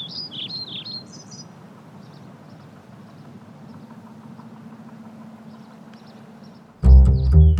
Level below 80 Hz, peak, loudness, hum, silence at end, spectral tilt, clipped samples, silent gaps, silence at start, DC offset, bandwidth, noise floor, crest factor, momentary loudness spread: -22 dBFS; -2 dBFS; -19 LUFS; none; 0 s; -7.5 dB/octave; under 0.1%; none; 0 s; under 0.1%; 6.6 kHz; -44 dBFS; 20 dB; 29 LU